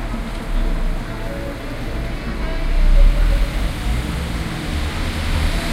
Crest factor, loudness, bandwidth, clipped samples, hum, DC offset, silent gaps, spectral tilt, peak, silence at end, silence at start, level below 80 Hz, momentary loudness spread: 16 dB; -23 LUFS; 13.5 kHz; under 0.1%; none; under 0.1%; none; -5.5 dB/octave; -2 dBFS; 0 s; 0 s; -18 dBFS; 9 LU